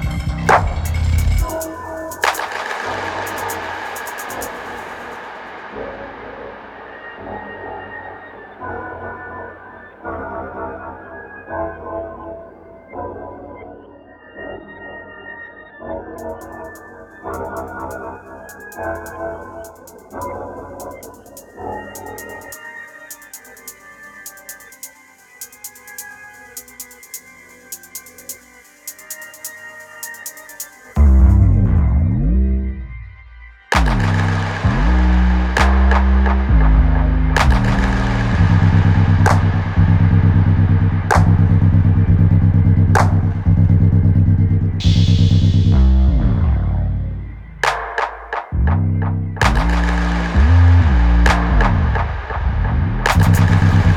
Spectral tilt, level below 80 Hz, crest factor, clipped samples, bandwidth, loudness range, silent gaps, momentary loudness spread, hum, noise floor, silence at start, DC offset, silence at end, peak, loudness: -6.5 dB/octave; -22 dBFS; 14 dB; under 0.1%; 17 kHz; 19 LU; none; 21 LU; none; -46 dBFS; 0 s; under 0.1%; 0 s; -2 dBFS; -16 LUFS